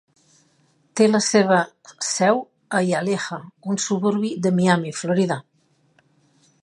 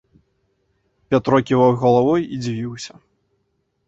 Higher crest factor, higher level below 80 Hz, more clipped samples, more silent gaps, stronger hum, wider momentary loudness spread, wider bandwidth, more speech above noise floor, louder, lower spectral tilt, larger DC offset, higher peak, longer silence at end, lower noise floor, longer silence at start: about the same, 20 dB vs 18 dB; second, -68 dBFS vs -54 dBFS; neither; neither; neither; second, 12 LU vs 15 LU; first, 11.5 kHz vs 8 kHz; second, 43 dB vs 52 dB; second, -21 LUFS vs -18 LUFS; second, -4.5 dB/octave vs -7 dB/octave; neither; about the same, -2 dBFS vs -2 dBFS; first, 1.2 s vs 1 s; second, -63 dBFS vs -69 dBFS; second, 0.95 s vs 1.1 s